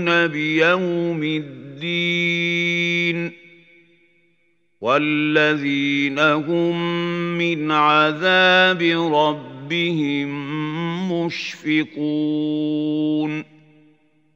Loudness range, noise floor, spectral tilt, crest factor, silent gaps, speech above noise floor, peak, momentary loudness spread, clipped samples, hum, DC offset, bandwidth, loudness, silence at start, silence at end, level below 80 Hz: 6 LU; -66 dBFS; -5.5 dB/octave; 18 dB; none; 47 dB; -2 dBFS; 10 LU; under 0.1%; none; under 0.1%; 7.6 kHz; -19 LUFS; 0 s; 0.95 s; -74 dBFS